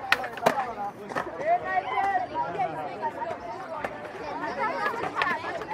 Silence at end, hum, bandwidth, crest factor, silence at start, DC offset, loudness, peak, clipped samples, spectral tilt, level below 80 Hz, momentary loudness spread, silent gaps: 0 s; none; 16 kHz; 30 dB; 0 s; under 0.1%; -29 LUFS; 0 dBFS; under 0.1%; -4 dB/octave; -62 dBFS; 9 LU; none